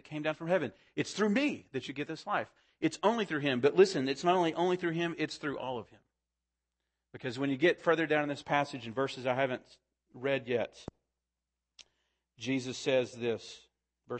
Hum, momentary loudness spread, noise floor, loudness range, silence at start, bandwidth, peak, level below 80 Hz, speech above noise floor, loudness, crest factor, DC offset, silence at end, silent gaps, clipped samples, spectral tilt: none; 12 LU; -89 dBFS; 7 LU; 0.1 s; 8.8 kHz; -12 dBFS; -74 dBFS; 57 dB; -32 LUFS; 22 dB; under 0.1%; 0 s; none; under 0.1%; -5 dB/octave